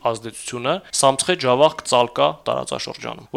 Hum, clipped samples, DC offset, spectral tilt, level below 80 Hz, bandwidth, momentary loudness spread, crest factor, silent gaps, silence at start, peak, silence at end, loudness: none; under 0.1%; under 0.1%; -3 dB/octave; -58 dBFS; 15.5 kHz; 12 LU; 18 dB; none; 0.05 s; -2 dBFS; 0 s; -20 LUFS